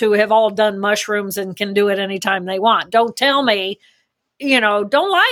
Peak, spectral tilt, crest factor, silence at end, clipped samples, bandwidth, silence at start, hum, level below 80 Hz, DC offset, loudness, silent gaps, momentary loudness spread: -2 dBFS; -3.5 dB/octave; 16 dB; 0 s; under 0.1%; over 20 kHz; 0 s; none; -68 dBFS; under 0.1%; -16 LUFS; none; 8 LU